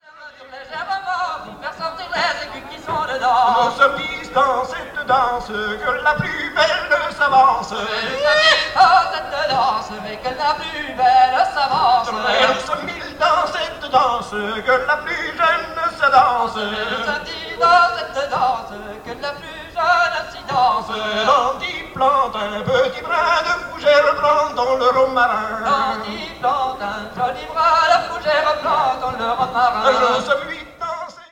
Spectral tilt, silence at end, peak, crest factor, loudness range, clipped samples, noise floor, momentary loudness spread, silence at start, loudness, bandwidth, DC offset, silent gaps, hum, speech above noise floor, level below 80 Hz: -3 dB/octave; 0.05 s; -2 dBFS; 16 dB; 3 LU; under 0.1%; -40 dBFS; 13 LU; 0.15 s; -18 LUFS; 16 kHz; under 0.1%; none; none; 23 dB; -48 dBFS